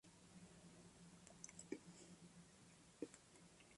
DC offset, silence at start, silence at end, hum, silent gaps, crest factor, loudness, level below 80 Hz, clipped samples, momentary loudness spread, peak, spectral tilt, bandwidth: under 0.1%; 0.05 s; 0 s; none; none; 28 dB; -61 LUFS; -82 dBFS; under 0.1%; 10 LU; -34 dBFS; -4 dB/octave; 11.5 kHz